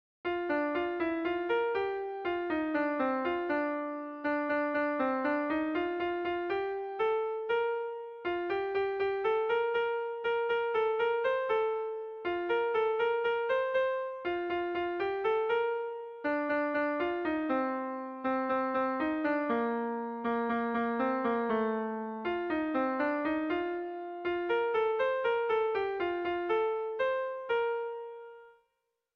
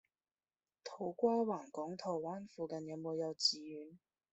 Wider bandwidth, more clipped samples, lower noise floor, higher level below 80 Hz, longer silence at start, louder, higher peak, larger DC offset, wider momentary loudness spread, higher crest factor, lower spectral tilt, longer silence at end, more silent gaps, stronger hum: second, 5.6 kHz vs 8.2 kHz; neither; second, -82 dBFS vs under -90 dBFS; first, -68 dBFS vs -84 dBFS; second, 0.25 s vs 0.85 s; first, -32 LUFS vs -39 LUFS; about the same, -18 dBFS vs -20 dBFS; neither; second, 6 LU vs 17 LU; second, 14 dB vs 22 dB; first, -6.5 dB/octave vs -4.5 dB/octave; first, 0.65 s vs 0.35 s; neither; neither